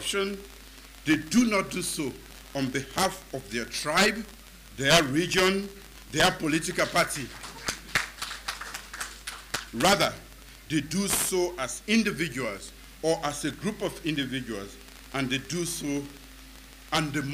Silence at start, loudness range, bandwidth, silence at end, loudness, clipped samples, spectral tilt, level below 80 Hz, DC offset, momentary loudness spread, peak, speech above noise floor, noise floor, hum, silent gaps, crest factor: 0 s; 6 LU; 16 kHz; 0 s; -27 LUFS; under 0.1%; -3.5 dB/octave; -50 dBFS; under 0.1%; 21 LU; -8 dBFS; 20 dB; -48 dBFS; none; none; 22 dB